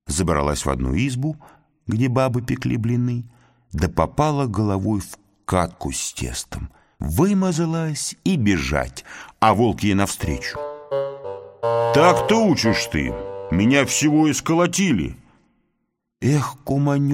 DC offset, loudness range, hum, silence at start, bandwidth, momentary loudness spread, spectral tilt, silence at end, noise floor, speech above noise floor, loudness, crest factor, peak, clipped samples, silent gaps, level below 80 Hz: under 0.1%; 5 LU; none; 0.05 s; 16.5 kHz; 14 LU; -5.5 dB/octave; 0 s; -74 dBFS; 54 dB; -21 LUFS; 20 dB; -2 dBFS; under 0.1%; none; -38 dBFS